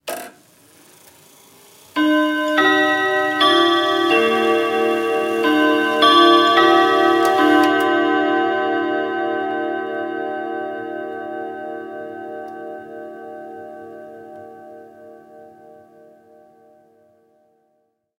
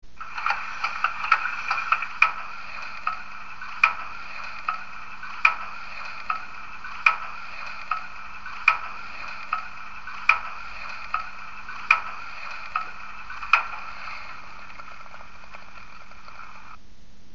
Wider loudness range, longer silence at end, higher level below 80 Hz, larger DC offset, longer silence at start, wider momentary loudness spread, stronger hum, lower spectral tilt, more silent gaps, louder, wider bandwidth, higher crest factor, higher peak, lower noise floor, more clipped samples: first, 20 LU vs 5 LU; first, 2.75 s vs 0 s; second, -70 dBFS vs -56 dBFS; second, under 0.1% vs 2%; about the same, 0.05 s vs 0 s; about the same, 22 LU vs 21 LU; neither; first, -3.5 dB/octave vs 1.5 dB/octave; neither; first, -16 LUFS vs -26 LUFS; first, 16 kHz vs 7.4 kHz; second, 20 dB vs 28 dB; about the same, 0 dBFS vs 0 dBFS; first, -67 dBFS vs -52 dBFS; neither